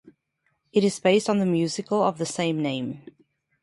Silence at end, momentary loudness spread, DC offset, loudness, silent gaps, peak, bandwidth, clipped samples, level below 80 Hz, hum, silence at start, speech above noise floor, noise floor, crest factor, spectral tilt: 0.65 s; 9 LU; under 0.1%; -24 LUFS; none; -6 dBFS; 11.5 kHz; under 0.1%; -68 dBFS; none; 0.75 s; 50 dB; -73 dBFS; 18 dB; -5.5 dB/octave